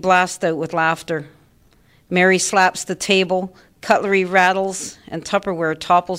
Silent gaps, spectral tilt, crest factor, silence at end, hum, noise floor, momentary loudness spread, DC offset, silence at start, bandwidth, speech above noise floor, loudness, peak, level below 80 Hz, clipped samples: none; -3.5 dB/octave; 16 dB; 0 s; none; -54 dBFS; 13 LU; under 0.1%; 0.05 s; 16 kHz; 36 dB; -18 LUFS; -2 dBFS; -58 dBFS; under 0.1%